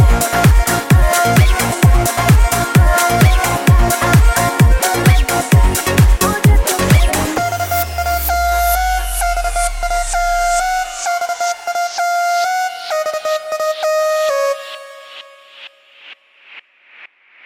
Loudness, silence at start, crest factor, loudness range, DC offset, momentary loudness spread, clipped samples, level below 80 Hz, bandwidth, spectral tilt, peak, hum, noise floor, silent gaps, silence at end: -14 LUFS; 0 s; 14 dB; 7 LU; under 0.1%; 8 LU; under 0.1%; -18 dBFS; 17 kHz; -4.5 dB/octave; 0 dBFS; none; -43 dBFS; none; 0.4 s